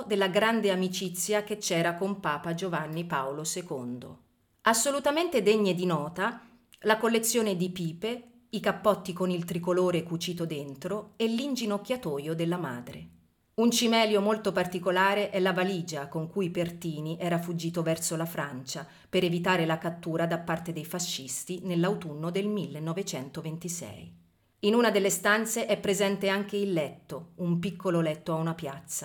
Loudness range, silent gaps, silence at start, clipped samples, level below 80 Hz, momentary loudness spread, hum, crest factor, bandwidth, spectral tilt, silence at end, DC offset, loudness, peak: 5 LU; none; 0 s; under 0.1%; -68 dBFS; 11 LU; none; 22 dB; 19 kHz; -4.5 dB/octave; 0 s; under 0.1%; -29 LUFS; -8 dBFS